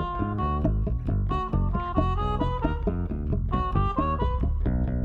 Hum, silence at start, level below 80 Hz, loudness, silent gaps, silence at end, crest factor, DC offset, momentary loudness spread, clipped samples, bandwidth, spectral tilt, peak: none; 0 s; -28 dBFS; -27 LUFS; none; 0 s; 14 dB; under 0.1%; 3 LU; under 0.1%; 4.7 kHz; -10 dB/octave; -10 dBFS